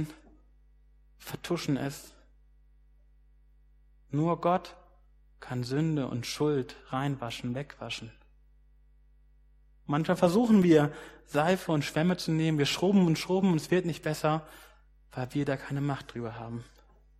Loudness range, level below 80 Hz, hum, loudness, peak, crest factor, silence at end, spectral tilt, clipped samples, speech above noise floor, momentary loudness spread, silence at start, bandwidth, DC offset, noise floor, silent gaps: 12 LU; -58 dBFS; none; -29 LUFS; -10 dBFS; 22 dB; 0.55 s; -6.5 dB/octave; under 0.1%; 32 dB; 17 LU; 0 s; 15 kHz; under 0.1%; -60 dBFS; none